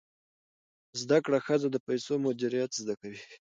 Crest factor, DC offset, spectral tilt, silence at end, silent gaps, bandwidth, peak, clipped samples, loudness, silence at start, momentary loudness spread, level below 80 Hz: 18 dB; under 0.1%; -5 dB/octave; 0.05 s; 1.80-1.86 s; 9.2 kHz; -12 dBFS; under 0.1%; -30 LUFS; 0.95 s; 13 LU; -78 dBFS